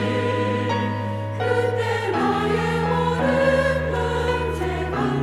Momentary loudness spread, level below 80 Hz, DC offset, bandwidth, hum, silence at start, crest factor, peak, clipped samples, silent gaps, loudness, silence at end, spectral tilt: 6 LU; -40 dBFS; under 0.1%; 14 kHz; none; 0 s; 14 dB; -8 dBFS; under 0.1%; none; -22 LUFS; 0 s; -6.5 dB/octave